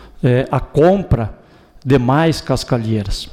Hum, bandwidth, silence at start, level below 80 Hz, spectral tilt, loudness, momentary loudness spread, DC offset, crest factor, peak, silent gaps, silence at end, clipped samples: none; 14.5 kHz; 0.05 s; -30 dBFS; -7 dB/octave; -16 LUFS; 7 LU; under 0.1%; 12 dB; -4 dBFS; none; 0 s; under 0.1%